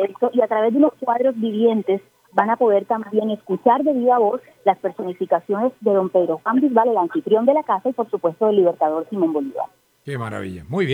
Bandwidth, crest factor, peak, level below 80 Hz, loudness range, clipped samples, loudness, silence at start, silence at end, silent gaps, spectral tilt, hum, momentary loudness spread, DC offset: 10.5 kHz; 18 dB; -2 dBFS; -64 dBFS; 2 LU; under 0.1%; -19 LUFS; 0 s; 0 s; none; -8 dB/octave; none; 10 LU; under 0.1%